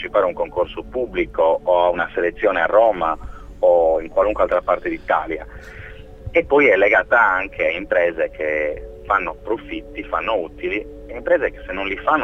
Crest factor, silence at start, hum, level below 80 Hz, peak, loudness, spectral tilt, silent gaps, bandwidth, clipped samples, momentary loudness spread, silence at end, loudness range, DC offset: 18 dB; 0 s; none; -40 dBFS; -2 dBFS; -19 LUFS; -6.5 dB/octave; none; 6.2 kHz; under 0.1%; 15 LU; 0 s; 5 LU; under 0.1%